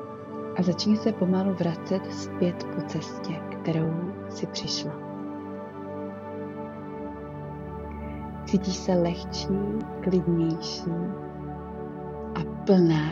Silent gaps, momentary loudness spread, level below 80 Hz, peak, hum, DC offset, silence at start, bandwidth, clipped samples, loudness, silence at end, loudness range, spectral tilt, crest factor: none; 13 LU; -50 dBFS; -8 dBFS; none; under 0.1%; 0 s; 7.6 kHz; under 0.1%; -29 LUFS; 0 s; 7 LU; -6.5 dB/octave; 20 dB